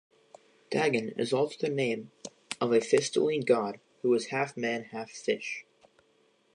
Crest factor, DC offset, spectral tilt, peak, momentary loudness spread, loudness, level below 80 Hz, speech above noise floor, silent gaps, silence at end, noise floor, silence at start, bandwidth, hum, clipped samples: 20 dB; under 0.1%; -4.5 dB/octave; -10 dBFS; 12 LU; -30 LUFS; -80 dBFS; 39 dB; none; 0.95 s; -68 dBFS; 0.7 s; 11 kHz; none; under 0.1%